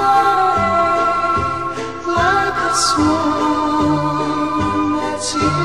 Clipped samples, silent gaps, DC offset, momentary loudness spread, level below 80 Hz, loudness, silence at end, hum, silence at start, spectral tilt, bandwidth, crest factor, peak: under 0.1%; none; 0.9%; 6 LU; -40 dBFS; -16 LUFS; 0 s; none; 0 s; -4.5 dB/octave; 13 kHz; 12 dB; -4 dBFS